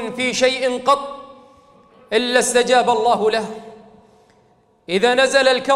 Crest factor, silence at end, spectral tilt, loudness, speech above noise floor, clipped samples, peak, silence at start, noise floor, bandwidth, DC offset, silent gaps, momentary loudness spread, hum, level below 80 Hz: 18 dB; 0 s; -2 dB/octave; -17 LUFS; 39 dB; under 0.1%; -2 dBFS; 0 s; -56 dBFS; 14.5 kHz; under 0.1%; none; 12 LU; none; -58 dBFS